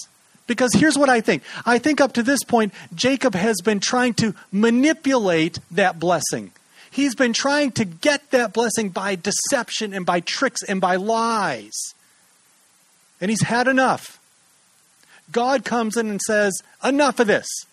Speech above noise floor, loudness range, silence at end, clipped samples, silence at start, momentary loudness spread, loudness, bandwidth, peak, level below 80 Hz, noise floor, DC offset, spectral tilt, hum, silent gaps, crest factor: 38 dB; 5 LU; 0.1 s; under 0.1%; 0 s; 8 LU; -20 LUFS; 13.5 kHz; -2 dBFS; -62 dBFS; -57 dBFS; under 0.1%; -3.5 dB/octave; none; none; 18 dB